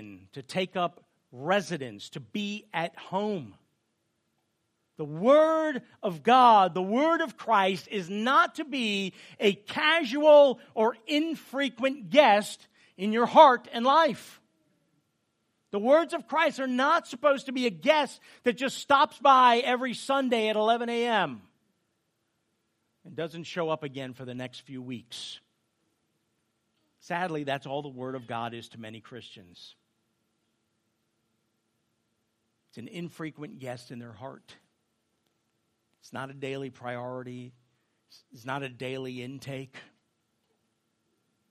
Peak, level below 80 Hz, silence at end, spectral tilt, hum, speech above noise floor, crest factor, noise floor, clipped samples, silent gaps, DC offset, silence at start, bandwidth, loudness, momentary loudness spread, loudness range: -4 dBFS; -82 dBFS; 1.7 s; -4.5 dB/octave; none; 50 dB; 24 dB; -77 dBFS; under 0.1%; none; under 0.1%; 0 s; 14.5 kHz; -25 LUFS; 21 LU; 19 LU